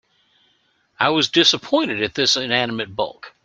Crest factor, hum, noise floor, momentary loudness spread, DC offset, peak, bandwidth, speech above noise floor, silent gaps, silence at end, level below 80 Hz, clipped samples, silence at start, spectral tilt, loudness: 20 dB; none; -63 dBFS; 11 LU; under 0.1%; -2 dBFS; 9.2 kHz; 43 dB; none; 0.15 s; -60 dBFS; under 0.1%; 1 s; -3 dB/octave; -18 LUFS